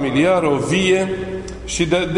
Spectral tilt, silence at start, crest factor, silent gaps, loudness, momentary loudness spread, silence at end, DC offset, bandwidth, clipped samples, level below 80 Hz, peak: -5 dB/octave; 0 s; 14 dB; none; -18 LUFS; 11 LU; 0 s; under 0.1%; 11 kHz; under 0.1%; -38 dBFS; -4 dBFS